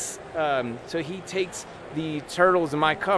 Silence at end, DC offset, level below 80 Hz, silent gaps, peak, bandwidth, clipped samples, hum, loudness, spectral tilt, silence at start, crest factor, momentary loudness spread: 0 s; under 0.1%; -58 dBFS; none; -6 dBFS; 11 kHz; under 0.1%; none; -26 LUFS; -4 dB/octave; 0 s; 20 dB; 11 LU